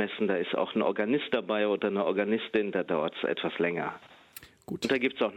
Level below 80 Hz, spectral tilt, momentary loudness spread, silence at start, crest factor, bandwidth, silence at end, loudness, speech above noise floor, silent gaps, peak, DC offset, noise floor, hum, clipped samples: -72 dBFS; -5.5 dB/octave; 14 LU; 0 s; 16 dB; 16 kHz; 0 s; -29 LUFS; 23 dB; none; -12 dBFS; under 0.1%; -52 dBFS; none; under 0.1%